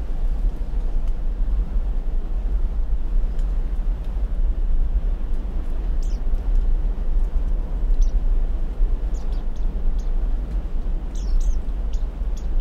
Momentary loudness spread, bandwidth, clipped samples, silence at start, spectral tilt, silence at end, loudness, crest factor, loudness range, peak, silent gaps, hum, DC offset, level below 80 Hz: 4 LU; 6.4 kHz; under 0.1%; 0 s; -7.5 dB/octave; 0 s; -28 LUFS; 12 dB; 2 LU; -8 dBFS; none; none; under 0.1%; -20 dBFS